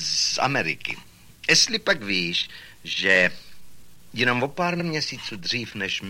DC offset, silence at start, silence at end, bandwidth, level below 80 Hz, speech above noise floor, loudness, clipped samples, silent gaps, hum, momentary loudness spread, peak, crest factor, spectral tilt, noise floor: under 0.1%; 0 s; 0 s; 16.5 kHz; -58 dBFS; 24 dB; -22 LUFS; under 0.1%; none; none; 12 LU; -6 dBFS; 20 dB; -2.5 dB/octave; -48 dBFS